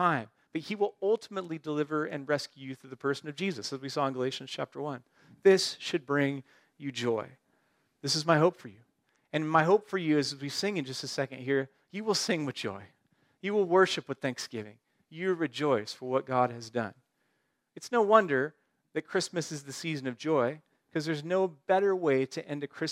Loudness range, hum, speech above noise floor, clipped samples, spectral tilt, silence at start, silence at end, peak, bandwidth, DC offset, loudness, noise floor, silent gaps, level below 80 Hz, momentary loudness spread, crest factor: 4 LU; none; 47 dB; under 0.1%; -4.5 dB/octave; 0 s; 0 s; -8 dBFS; 15 kHz; under 0.1%; -30 LUFS; -77 dBFS; none; -82 dBFS; 14 LU; 24 dB